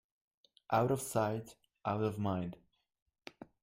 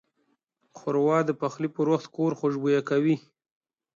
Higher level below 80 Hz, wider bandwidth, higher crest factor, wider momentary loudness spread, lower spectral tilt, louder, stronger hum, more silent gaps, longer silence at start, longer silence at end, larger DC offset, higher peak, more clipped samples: first, -70 dBFS vs -76 dBFS; first, 16 kHz vs 7.6 kHz; about the same, 20 dB vs 16 dB; first, 22 LU vs 6 LU; second, -6 dB/octave vs -7.5 dB/octave; second, -36 LUFS vs -26 LUFS; neither; first, 3.02-3.06 s vs none; about the same, 0.7 s vs 0.75 s; second, 0.2 s vs 0.8 s; neither; second, -18 dBFS vs -12 dBFS; neither